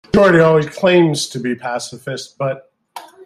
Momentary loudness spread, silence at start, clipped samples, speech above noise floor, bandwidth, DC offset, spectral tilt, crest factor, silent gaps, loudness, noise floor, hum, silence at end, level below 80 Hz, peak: 16 LU; 0.15 s; under 0.1%; 23 dB; 13.5 kHz; under 0.1%; -5.5 dB/octave; 14 dB; none; -15 LUFS; -38 dBFS; none; 0.2 s; -46 dBFS; 0 dBFS